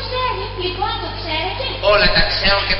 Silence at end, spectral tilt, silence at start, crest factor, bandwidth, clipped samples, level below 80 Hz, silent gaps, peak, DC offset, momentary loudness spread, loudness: 0 s; -1 dB/octave; 0 s; 16 dB; 6 kHz; under 0.1%; -28 dBFS; none; -2 dBFS; under 0.1%; 10 LU; -17 LUFS